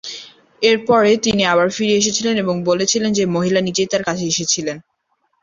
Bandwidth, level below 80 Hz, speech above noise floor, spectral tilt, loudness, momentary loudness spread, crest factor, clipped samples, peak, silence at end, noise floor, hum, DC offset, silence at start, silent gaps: 7.8 kHz; -54 dBFS; 51 dB; -3.5 dB/octave; -16 LUFS; 6 LU; 16 dB; under 0.1%; -2 dBFS; 0.65 s; -67 dBFS; none; under 0.1%; 0.05 s; none